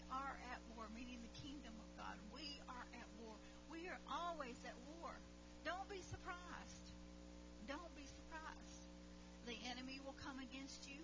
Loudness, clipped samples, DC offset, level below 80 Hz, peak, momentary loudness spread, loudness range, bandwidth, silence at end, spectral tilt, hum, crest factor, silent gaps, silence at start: -54 LUFS; under 0.1%; under 0.1%; -64 dBFS; -36 dBFS; 10 LU; 3 LU; 7.8 kHz; 0 s; -4 dB/octave; 60 Hz at -65 dBFS; 18 dB; none; 0 s